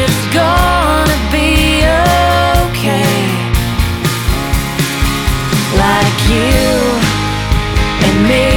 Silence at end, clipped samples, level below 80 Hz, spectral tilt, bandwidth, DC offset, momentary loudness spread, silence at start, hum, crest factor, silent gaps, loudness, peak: 0 s; under 0.1%; -18 dBFS; -5 dB/octave; 20 kHz; under 0.1%; 5 LU; 0 s; none; 12 dB; none; -12 LUFS; 0 dBFS